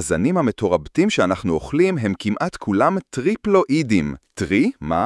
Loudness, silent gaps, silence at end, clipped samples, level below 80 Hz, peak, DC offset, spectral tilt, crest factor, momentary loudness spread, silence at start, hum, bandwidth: -20 LUFS; none; 0 s; under 0.1%; -46 dBFS; -2 dBFS; under 0.1%; -6 dB/octave; 18 dB; 5 LU; 0 s; none; 12 kHz